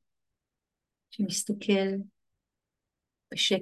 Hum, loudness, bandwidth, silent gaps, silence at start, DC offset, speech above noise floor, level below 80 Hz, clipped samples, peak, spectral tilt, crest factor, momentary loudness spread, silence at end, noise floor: none; -30 LUFS; 12.5 kHz; none; 1.1 s; under 0.1%; 60 dB; -80 dBFS; under 0.1%; -12 dBFS; -3.5 dB/octave; 20 dB; 16 LU; 0 s; -88 dBFS